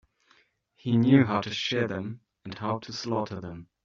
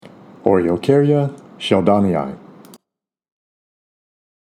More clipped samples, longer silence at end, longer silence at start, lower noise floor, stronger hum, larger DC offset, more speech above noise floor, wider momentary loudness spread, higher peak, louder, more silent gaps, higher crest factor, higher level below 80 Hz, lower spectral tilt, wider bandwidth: neither; second, 0.2 s vs 2.05 s; first, 0.85 s vs 0.05 s; second, -65 dBFS vs -81 dBFS; neither; neither; second, 38 dB vs 65 dB; first, 19 LU vs 12 LU; second, -8 dBFS vs 0 dBFS; second, -27 LUFS vs -17 LUFS; neither; about the same, 20 dB vs 20 dB; second, -66 dBFS vs -56 dBFS; second, -5.5 dB/octave vs -7.5 dB/octave; second, 7.4 kHz vs 12.5 kHz